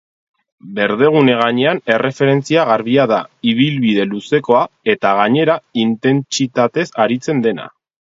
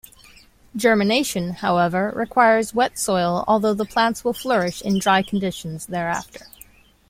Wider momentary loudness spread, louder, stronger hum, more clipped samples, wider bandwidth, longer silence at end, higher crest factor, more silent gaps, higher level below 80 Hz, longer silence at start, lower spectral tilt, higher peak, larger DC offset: second, 5 LU vs 11 LU; first, -15 LUFS vs -20 LUFS; neither; neither; second, 7.8 kHz vs 16.5 kHz; second, 0.45 s vs 0.7 s; about the same, 14 dB vs 18 dB; neither; second, -62 dBFS vs -52 dBFS; about the same, 0.65 s vs 0.75 s; about the same, -5.5 dB/octave vs -4.5 dB/octave; about the same, 0 dBFS vs -2 dBFS; neither